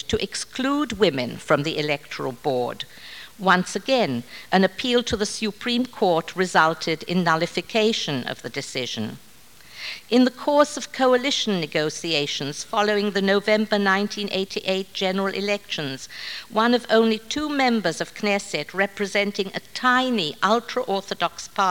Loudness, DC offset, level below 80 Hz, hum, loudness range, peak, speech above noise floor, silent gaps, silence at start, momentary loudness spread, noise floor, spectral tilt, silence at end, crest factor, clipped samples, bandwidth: -23 LUFS; 0.3%; -56 dBFS; none; 2 LU; -2 dBFS; 25 dB; none; 0.1 s; 9 LU; -48 dBFS; -4 dB/octave; 0 s; 20 dB; under 0.1%; 18 kHz